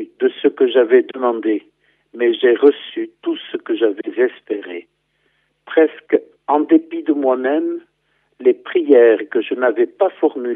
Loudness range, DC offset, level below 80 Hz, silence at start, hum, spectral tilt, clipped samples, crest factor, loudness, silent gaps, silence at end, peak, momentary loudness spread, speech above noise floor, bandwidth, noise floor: 4 LU; under 0.1%; -76 dBFS; 0 s; none; -7.5 dB/octave; under 0.1%; 16 dB; -17 LUFS; none; 0 s; 0 dBFS; 12 LU; 49 dB; 3.8 kHz; -65 dBFS